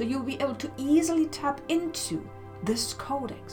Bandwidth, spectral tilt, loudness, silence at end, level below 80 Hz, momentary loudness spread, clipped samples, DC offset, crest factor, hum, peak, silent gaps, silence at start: 19.5 kHz; -4 dB/octave; -29 LUFS; 0 s; -58 dBFS; 9 LU; under 0.1%; under 0.1%; 16 dB; none; -12 dBFS; none; 0 s